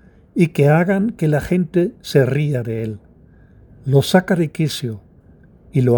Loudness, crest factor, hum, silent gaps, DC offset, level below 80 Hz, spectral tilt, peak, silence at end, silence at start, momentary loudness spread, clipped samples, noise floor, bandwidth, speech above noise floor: -18 LUFS; 18 dB; none; none; under 0.1%; -48 dBFS; -7 dB/octave; 0 dBFS; 0 s; 0.35 s; 13 LU; under 0.1%; -47 dBFS; over 20 kHz; 31 dB